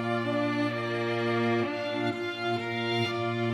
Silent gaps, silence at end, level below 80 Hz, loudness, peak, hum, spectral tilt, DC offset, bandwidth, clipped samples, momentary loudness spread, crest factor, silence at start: none; 0 s; -70 dBFS; -29 LUFS; -16 dBFS; none; -6.5 dB/octave; under 0.1%; 12.5 kHz; under 0.1%; 3 LU; 12 dB; 0 s